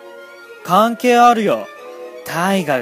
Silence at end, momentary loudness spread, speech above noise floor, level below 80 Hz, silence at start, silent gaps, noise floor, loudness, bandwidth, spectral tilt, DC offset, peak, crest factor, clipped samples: 0 s; 22 LU; 24 dB; -68 dBFS; 0.05 s; none; -37 dBFS; -15 LUFS; 15.5 kHz; -5 dB/octave; under 0.1%; 0 dBFS; 16 dB; under 0.1%